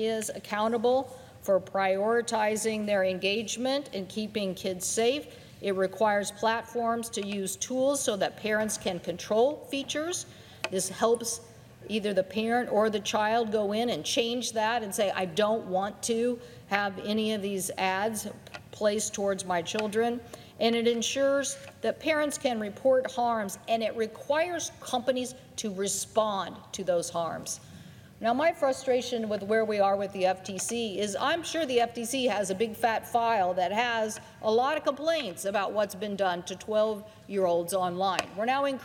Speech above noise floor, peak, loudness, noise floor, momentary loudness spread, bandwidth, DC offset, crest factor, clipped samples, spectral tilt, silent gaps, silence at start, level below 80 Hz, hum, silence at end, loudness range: 20 dB; -6 dBFS; -29 LUFS; -49 dBFS; 8 LU; 17 kHz; under 0.1%; 22 dB; under 0.1%; -3 dB/octave; none; 0 s; -68 dBFS; none; 0 s; 2 LU